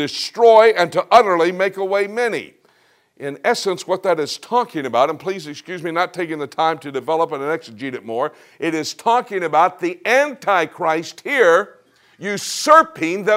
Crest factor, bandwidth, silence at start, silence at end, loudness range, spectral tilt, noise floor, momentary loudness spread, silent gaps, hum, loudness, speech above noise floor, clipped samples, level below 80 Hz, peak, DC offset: 18 dB; 16 kHz; 0 s; 0 s; 6 LU; -3.5 dB/octave; -58 dBFS; 14 LU; none; none; -18 LUFS; 40 dB; under 0.1%; -66 dBFS; 0 dBFS; under 0.1%